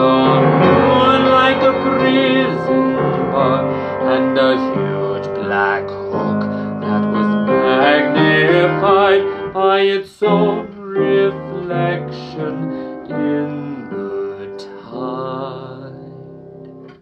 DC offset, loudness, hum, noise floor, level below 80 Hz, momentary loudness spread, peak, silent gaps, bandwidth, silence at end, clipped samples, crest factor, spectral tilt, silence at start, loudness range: under 0.1%; -15 LUFS; none; -36 dBFS; -52 dBFS; 15 LU; 0 dBFS; none; 8 kHz; 0.1 s; under 0.1%; 16 dB; -8 dB/octave; 0 s; 11 LU